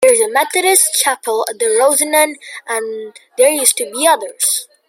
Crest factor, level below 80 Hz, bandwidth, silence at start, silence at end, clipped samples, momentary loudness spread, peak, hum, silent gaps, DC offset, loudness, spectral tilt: 14 dB; -68 dBFS; over 20 kHz; 0 s; 0.25 s; under 0.1%; 11 LU; 0 dBFS; none; none; under 0.1%; -13 LUFS; 1 dB/octave